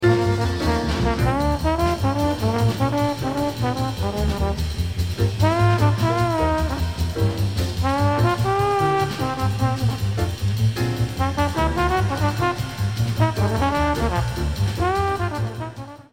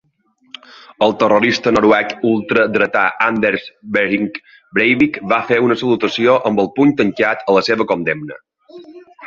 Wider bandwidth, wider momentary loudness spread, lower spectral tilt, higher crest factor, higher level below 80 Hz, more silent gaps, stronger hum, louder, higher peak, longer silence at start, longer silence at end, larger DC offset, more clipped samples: first, 16.5 kHz vs 7.4 kHz; second, 5 LU vs 8 LU; about the same, -6.5 dB/octave vs -5.5 dB/octave; about the same, 16 dB vs 16 dB; first, -32 dBFS vs -54 dBFS; neither; neither; second, -22 LUFS vs -15 LUFS; second, -4 dBFS vs 0 dBFS; second, 0 s vs 1 s; about the same, 0.1 s vs 0 s; first, 0.3% vs under 0.1%; neither